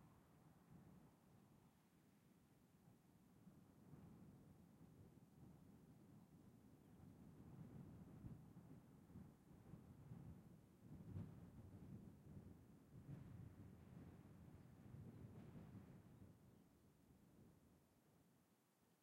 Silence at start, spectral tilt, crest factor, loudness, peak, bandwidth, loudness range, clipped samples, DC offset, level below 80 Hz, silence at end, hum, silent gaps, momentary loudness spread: 0 s; -8 dB/octave; 22 dB; -64 LUFS; -42 dBFS; 16 kHz; 6 LU; under 0.1%; under 0.1%; -78 dBFS; 0 s; none; none; 8 LU